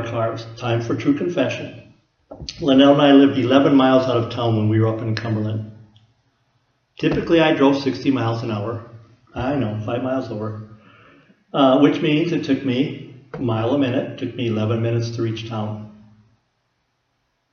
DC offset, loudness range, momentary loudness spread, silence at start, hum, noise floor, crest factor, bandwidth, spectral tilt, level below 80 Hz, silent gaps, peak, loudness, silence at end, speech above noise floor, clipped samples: under 0.1%; 9 LU; 16 LU; 0 s; none; -70 dBFS; 20 dB; 6.8 kHz; -7.5 dB/octave; -52 dBFS; none; 0 dBFS; -19 LUFS; 1.6 s; 51 dB; under 0.1%